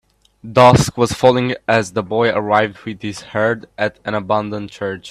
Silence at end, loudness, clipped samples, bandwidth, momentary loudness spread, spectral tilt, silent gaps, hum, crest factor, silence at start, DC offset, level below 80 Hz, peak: 0 s; -16 LUFS; under 0.1%; 14 kHz; 15 LU; -5.5 dB/octave; none; none; 16 dB; 0.45 s; under 0.1%; -44 dBFS; 0 dBFS